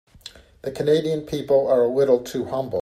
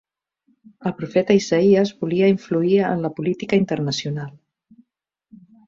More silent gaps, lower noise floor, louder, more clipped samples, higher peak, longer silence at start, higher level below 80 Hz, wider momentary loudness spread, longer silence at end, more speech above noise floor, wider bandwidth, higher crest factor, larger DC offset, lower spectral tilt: neither; second, -45 dBFS vs -73 dBFS; about the same, -21 LUFS vs -20 LUFS; neither; about the same, -6 dBFS vs -4 dBFS; second, 0.25 s vs 0.8 s; first, -54 dBFS vs -60 dBFS; first, 20 LU vs 12 LU; second, 0 s vs 1.4 s; second, 25 dB vs 53 dB; first, 14 kHz vs 7.6 kHz; about the same, 16 dB vs 18 dB; neither; about the same, -6.5 dB/octave vs -6.5 dB/octave